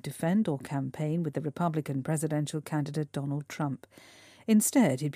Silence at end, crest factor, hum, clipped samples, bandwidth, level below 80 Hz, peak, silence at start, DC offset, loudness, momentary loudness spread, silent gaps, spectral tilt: 0.05 s; 18 dB; none; under 0.1%; 15.5 kHz; -72 dBFS; -12 dBFS; 0.05 s; under 0.1%; -30 LUFS; 10 LU; none; -6 dB/octave